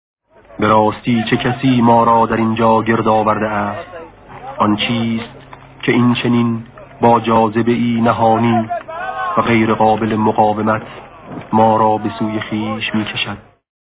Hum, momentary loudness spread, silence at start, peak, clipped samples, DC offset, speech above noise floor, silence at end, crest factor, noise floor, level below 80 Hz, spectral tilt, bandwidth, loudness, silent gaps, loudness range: none; 12 LU; 0.5 s; 0 dBFS; under 0.1%; under 0.1%; 20 dB; 0.4 s; 14 dB; -34 dBFS; -46 dBFS; -10.5 dB/octave; 4 kHz; -15 LUFS; none; 4 LU